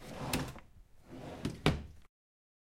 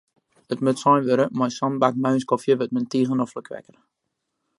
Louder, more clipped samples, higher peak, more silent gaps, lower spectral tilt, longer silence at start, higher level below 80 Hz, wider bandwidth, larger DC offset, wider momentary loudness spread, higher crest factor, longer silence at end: second, -38 LUFS vs -22 LUFS; neither; second, -12 dBFS vs -4 dBFS; neither; second, -5 dB/octave vs -6.5 dB/octave; second, 0 s vs 0.5 s; first, -50 dBFS vs -72 dBFS; first, 16.5 kHz vs 11.5 kHz; neither; first, 20 LU vs 13 LU; first, 28 dB vs 20 dB; second, 0.65 s vs 1 s